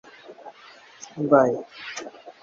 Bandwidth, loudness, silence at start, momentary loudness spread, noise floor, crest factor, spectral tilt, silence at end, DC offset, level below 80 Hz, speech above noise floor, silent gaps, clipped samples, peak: 7.6 kHz; -23 LUFS; 0.3 s; 25 LU; -49 dBFS; 22 dB; -5.5 dB/octave; 0.1 s; under 0.1%; -74 dBFS; 27 dB; none; under 0.1%; -4 dBFS